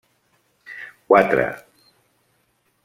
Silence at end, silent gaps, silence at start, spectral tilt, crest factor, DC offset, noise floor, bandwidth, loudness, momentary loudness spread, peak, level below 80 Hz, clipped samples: 1.25 s; none; 0.7 s; -7 dB/octave; 22 dB; under 0.1%; -66 dBFS; 16 kHz; -18 LUFS; 23 LU; -2 dBFS; -58 dBFS; under 0.1%